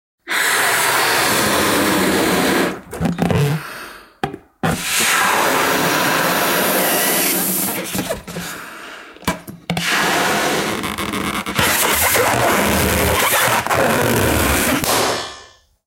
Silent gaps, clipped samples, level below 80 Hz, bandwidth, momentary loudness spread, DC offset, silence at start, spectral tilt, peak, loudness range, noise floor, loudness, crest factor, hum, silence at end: none; under 0.1%; -38 dBFS; 17 kHz; 13 LU; under 0.1%; 0.25 s; -3 dB/octave; -2 dBFS; 5 LU; -44 dBFS; -16 LUFS; 16 dB; none; 0.4 s